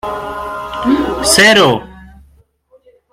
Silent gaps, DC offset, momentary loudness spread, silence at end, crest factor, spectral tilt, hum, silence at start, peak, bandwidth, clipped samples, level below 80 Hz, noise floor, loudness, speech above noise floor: none; under 0.1%; 16 LU; 1.05 s; 14 dB; -2.5 dB/octave; none; 0.05 s; 0 dBFS; 16.5 kHz; under 0.1%; -38 dBFS; -50 dBFS; -11 LUFS; 40 dB